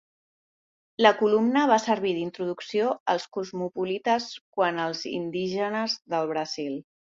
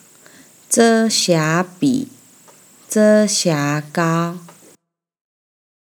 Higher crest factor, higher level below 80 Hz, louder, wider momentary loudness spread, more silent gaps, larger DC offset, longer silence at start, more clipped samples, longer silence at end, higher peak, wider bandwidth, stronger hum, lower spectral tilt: about the same, 22 dB vs 18 dB; first, -72 dBFS vs -80 dBFS; second, -26 LUFS vs -16 LUFS; about the same, 11 LU vs 10 LU; first, 3.00-3.06 s, 4.41-4.53 s vs none; neither; first, 1 s vs 0.7 s; neither; second, 0.3 s vs 1.4 s; second, -4 dBFS vs 0 dBFS; second, 7.6 kHz vs 20 kHz; neither; about the same, -4.5 dB/octave vs -4 dB/octave